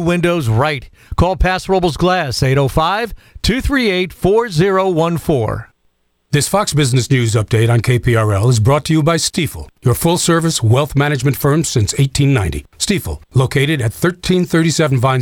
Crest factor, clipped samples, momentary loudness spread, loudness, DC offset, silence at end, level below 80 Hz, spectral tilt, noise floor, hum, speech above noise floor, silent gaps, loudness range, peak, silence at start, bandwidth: 12 dB; under 0.1%; 5 LU; -15 LUFS; under 0.1%; 0 s; -30 dBFS; -5.5 dB/octave; -61 dBFS; none; 47 dB; none; 2 LU; -2 dBFS; 0 s; 17.5 kHz